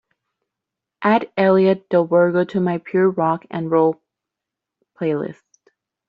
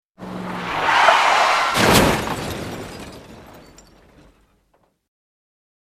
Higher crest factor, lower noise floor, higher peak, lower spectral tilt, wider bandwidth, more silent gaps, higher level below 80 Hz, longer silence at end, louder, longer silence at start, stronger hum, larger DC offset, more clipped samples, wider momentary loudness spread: about the same, 18 dB vs 20 dB; first, -85 dBFS vs -63 dBFS; about the same, -2 dBFS vs 0 dBFS; first, -6.5 dB/octave vs -3.5 dB/octave; second, 6 kHz vs 16 kHz; neither; second, -66 dBFS vs -42 dBFS; second, 0.75 s vs 2.4 s; about the same, -18 LUFS vs -17 LUFS; first, 1 s vs 0.2 s; neither; neither; neither; second, 9 LU vs 21 LU